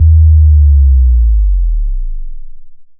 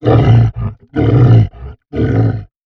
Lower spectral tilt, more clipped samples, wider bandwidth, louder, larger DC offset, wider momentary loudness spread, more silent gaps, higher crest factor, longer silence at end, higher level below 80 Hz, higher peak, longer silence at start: first, -28 dB/octave vs -10 dB/octave; neither; second, 0.2 kHz vs 4.4 kHz; about the same, -10 LUFS vs -12 LUFS; neither; first, 17 LU vs 12 LU; neither; about the same, 8 dB vs 10 dB; about the same, 0.15 s vs 0.2 s; first, -8 dBFS vs -26 dBFS; about the same, 0 dBFS vs 0 dBFS; about the same, 0 s vs 0 s